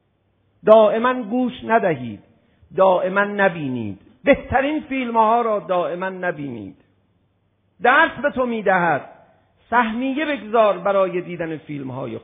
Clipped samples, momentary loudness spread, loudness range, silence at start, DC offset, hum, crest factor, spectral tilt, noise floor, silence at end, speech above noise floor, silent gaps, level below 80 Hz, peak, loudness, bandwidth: under 0.1%; 14 LU; 3 LU; 0.65 s; under 0.1%; none; 20 dB; -9.5 dB/octave; -65 dBFS; 0.05 s; 46 dB; none; -52 dBFS; 0 dBFS; -19 LUFS; 3.9 kHz